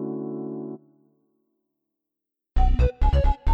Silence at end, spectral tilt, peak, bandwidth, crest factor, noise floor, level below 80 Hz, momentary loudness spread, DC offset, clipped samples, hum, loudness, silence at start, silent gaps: 0 s; -9 dB/octave; -10 dBFS; 5.4 kHz; 14 dB; -86 dBFS; -24 dBFS; 14 LU; under 0.1%; under 0.1%; none; -26 LUFS; 0 s; none